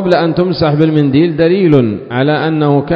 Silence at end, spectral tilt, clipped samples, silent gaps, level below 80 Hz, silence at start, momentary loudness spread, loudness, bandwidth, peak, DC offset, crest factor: 0 s; -9.5 dB/octave; 0.5%; none; -42 dBFS; 0 s; 4 LU; -11 LUFS; 6.2 kHz; 0 dBFS; under 0.1%; 10 dB